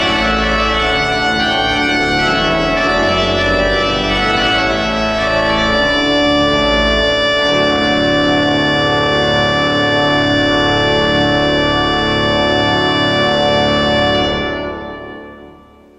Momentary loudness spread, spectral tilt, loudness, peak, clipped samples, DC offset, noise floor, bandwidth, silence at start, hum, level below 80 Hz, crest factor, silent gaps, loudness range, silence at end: 2 LU; -4.5 dB/octave; -13 LUFS; -2 dBFS; under 0.1%; under 0.1%; -41 dBFS; 11 kHz; 0 s; none; -30 dBFS; 12 dB; none; 1 LU; 0.45 s